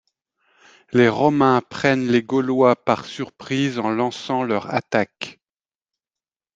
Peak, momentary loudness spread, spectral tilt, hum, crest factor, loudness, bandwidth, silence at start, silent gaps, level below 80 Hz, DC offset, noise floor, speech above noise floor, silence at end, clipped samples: -2 dBFS; 10 LU; -6 dB/octave; none; 20 dB; -20 LUFS; 7.8 kHz; 0.9 s; none; -62 dBFS; under 0.1%; under -90 dBFS; over 71 dB; 1.25 s; under 0.1%